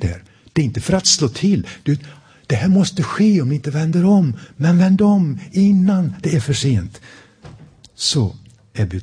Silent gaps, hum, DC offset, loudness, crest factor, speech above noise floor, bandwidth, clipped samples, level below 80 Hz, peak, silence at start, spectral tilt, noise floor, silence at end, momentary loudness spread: none; none; under 0.1%; -17 LUFS; 16 dB; 27 dB; 10.5 kHz; under 0.1%; -44 dBFS; 0 dBFS; 0 s; -5.5 dB/octave; -43 dBFS; 0 s; 10 LU